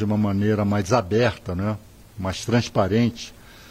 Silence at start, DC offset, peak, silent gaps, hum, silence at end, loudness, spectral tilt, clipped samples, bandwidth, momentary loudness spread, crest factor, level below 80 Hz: 0 s; under 0.1%; -6 dBFS; none; none; 0 s; -23 LUFS; -6.5 dB/octave; under 0.1%; 15.5 kHz; 11 LU; 16 dB; -48 dBFS